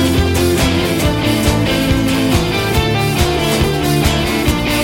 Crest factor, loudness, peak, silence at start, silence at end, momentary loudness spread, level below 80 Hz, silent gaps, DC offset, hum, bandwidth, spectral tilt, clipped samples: 12 dB; -14 LUFS; -2 dBFS; 0 s; 0 s; 1 LU; -24 dBFS; none; 0.2%; none; 17 kHz; -5 dB/octave; under 0.1%